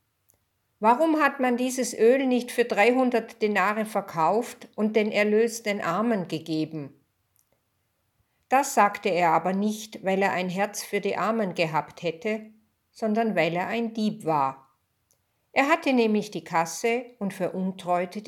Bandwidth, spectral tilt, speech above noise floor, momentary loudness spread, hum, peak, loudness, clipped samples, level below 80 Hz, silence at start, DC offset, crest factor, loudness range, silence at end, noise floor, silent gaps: 18 kHz; -5 dB/octave; 49 dB; 9 LU; none; -6 dBFS; -25 LUFS; under 0.1%; -78 dBFS; 0.8 s; under 0.1%; 20 dB; 5 LU; 0 s; -74 dBFS; none